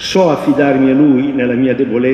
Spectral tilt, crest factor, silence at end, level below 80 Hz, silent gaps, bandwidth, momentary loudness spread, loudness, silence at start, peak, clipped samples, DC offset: -6.5 dB/octave; 10 dB; 0 s; -48 dBFS; none; 9 kHz; 4 LU; -12 LUFS; 0 s; 0 dBFS; under 0.1%; under 0.1%